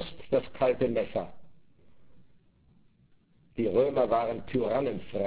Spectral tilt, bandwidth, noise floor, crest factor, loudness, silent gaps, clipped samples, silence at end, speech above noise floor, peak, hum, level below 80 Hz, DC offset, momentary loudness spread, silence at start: -10.5 dB/octave; 4 kHz; -63 dBFS; 18 dB; -29 LUFS; none; under 0.1%; 0 s; 35 dB; -14 dBFS; none; -58 dBFS; 0.4%; 9 LU; 0 s